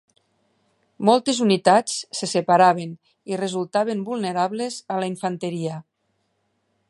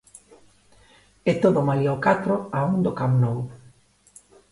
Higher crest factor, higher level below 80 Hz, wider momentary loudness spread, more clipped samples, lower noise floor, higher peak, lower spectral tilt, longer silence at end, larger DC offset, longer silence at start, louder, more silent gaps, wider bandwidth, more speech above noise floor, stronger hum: about the same, 20 dB vs 18 dB; second, -74 dBFS vs -56 dBFS; first, 13 LU vs 7 LU; neither; first, -71 dBFS vs -55 dBFS; first, -2 dBFS vs -6 dBFS; second, -4.5 dB/octave vs -8 dB/octave; first, 1.1 s vs 0.95 s; neither; second, 1 s vs 1.25 s; about the same, -22 LUFS vs -22 LUFS; neither; about the same, 11.5 kHz vs 11.5 kHz; first, 50 dB vs 34 dB; second, none vs 50 Hz at -45 dBFS